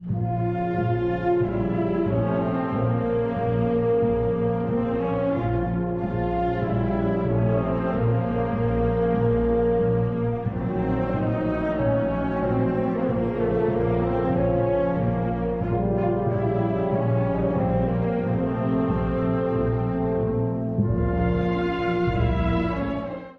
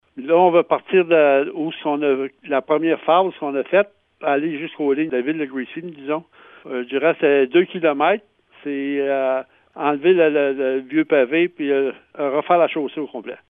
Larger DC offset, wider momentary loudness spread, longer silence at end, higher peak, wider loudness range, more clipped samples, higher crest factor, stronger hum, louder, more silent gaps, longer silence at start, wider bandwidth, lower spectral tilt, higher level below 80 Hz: neither; second, 3 LU vs 12 LU; about the same, 0.05 s vs 0.15 s; second, -10 dBFS vs -2 dBFS; second, 1 LU vs 4 LU; neither; about the same, 14 dB vs 18 dB; neither; second, -24 LUFS vs -19 LUFS; neither; second, 0 s vs 0.15 s; first, 4.7 kHz vs 3.8 kHz; first, -11 dB/octave vs -9 dB/octave; first, -36 dBFS vs -74 dBFS